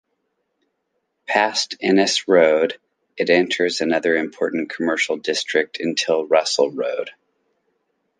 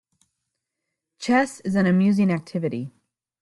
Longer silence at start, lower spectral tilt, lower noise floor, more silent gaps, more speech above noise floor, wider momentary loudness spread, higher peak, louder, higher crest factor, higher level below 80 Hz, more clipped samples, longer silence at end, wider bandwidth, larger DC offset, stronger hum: about the same, 1.3 s vs 1.2 s; second, -3 dB/octave vs -7 dB/octave; second, -73 dBFS vs -82 dBFS; neither; second, 54 dB vs 61 dB; second, 9 LU vs 14 LU; first, -2 dBFS vs -8 dBFS; first, -19 LUFS vs -22 LUFS; about the same, 18 dB vs 16 dB; second, -72 dBFS vs -64 dBFS; neither; first, 1.1 s vs 0.55 s; second, 10 kHz vs 11.5 kHz; neither; neither